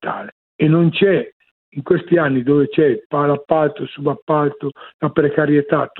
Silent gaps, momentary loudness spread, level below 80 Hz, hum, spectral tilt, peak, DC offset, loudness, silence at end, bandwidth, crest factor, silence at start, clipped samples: 0.32-0.59 s, 1.32-1.40 s, 1.51-1.72 s, 3.05-3.10 s, 4.22-4.27 s, 4.94-4.99 s; 14 LU; -58 dBFS; none; -11.5 dB/octave; 0 dBFS; under 0.1%; -17 LUFS; 0 s; 4.2 kHz; 16 dB; 0 s; under 0.1%